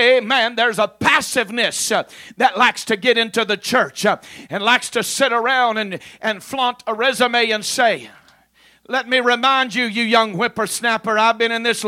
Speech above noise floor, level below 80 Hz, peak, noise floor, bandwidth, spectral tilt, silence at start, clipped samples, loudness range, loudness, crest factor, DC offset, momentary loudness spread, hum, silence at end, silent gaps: 36 dB; -62 dBFS; 0 dBFS; -54 dBFS; 16.5 kHz; -2 dB/octave; 0 s; under 0.1%; 2 LU; -17 LUFS; 18 dB; under 0.1%; 8 LU; none; 0 s; none